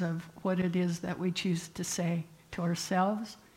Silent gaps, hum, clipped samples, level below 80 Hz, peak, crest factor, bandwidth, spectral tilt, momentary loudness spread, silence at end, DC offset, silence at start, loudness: none; none; under 0.1%; -66 dBFS; -18 dBFS; 14 dB; 16 kHz; -5.5 dB/octave; 6 LU; 0.2 s; under 0.1%; 0 s; -33 LUFS